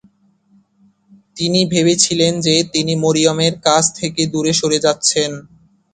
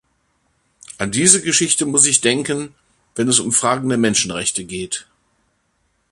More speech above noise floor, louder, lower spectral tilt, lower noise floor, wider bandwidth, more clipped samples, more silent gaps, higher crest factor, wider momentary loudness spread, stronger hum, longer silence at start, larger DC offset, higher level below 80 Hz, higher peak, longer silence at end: second, 40 dB vs 49 dB; about the same, -15 LUFS vs -16 LUFS; about the same, -3.5 dB/octave vs -2.5 dB/octave; second, -55 dBFS vs -66 dBFS; second, 9.6 kHz vs 16 kHz; neither; neither; about the same, 16 dB vs 20 dB; second, 6 LU vs 14 LU; neither; first, 1.35 s vs 0.9 s; neither; about the same, -54 dBFS vs -54 dBFS; about the same, 0 dBFS vs 0 dBFS; second, 0.5 s vs 1.1 s